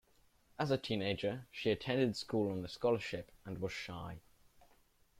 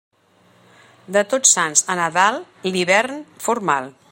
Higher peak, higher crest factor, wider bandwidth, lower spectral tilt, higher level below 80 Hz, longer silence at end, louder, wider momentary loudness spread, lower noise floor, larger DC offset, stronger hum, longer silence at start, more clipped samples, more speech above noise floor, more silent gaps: second, -20 dBFS vs 0 dBFS; about the same, 18 dB vs 20 dB; about the same, 16 kHz vs 16.5 kHz; first, -6 dB/octave vs -1.5 dB/octave; first, -66 dBFS vs -72 dBFS; first, 1 s vs 0.2 s; second, -38 LUFS vs -18 LUFS; about the same, 13 LU vs 11 LU; first, -70 dBFS vs -56 dBFS; neither; neither; second, 0.6 s vs 1.1 s; neither; second, 32 dB vs 37 dB; neither